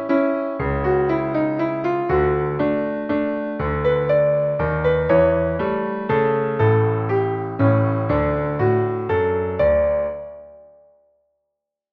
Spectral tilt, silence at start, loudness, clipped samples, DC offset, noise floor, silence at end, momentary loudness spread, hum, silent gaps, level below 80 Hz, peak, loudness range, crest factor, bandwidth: -10.5 dB/octave; 0 s; -20 LUFS; under 0.1%; under 0.1%; -80 dBFS; 1.35 s; 6 LU; none; none; -38 dBFS; -4 dBFS; 2 LU; 16 dB; 5.2 kHz